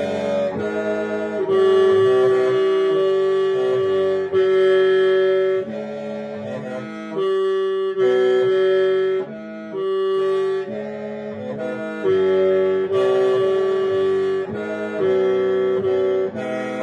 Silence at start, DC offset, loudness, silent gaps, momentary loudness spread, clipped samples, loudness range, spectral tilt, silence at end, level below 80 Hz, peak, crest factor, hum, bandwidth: 0 s; under 0.1%; -19 LUFS; none; 13 LU; under 0.1%; 4 LU; -6.5 dB/octave; 0 s; -66 dBFS; -6 dBFS; 12 dB; none; 8 kHz